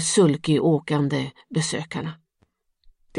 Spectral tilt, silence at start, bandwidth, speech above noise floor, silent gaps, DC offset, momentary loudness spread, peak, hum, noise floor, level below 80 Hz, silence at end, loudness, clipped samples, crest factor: -5 dB/octave; 0 s; 11.5 kHz; 46 dB; none; under 0.1%; 12 LU; -6 dBFS; none; -68 dBFS; -62 dBFS; 0 s; -23 LUFS; under 0.1%; 18 dB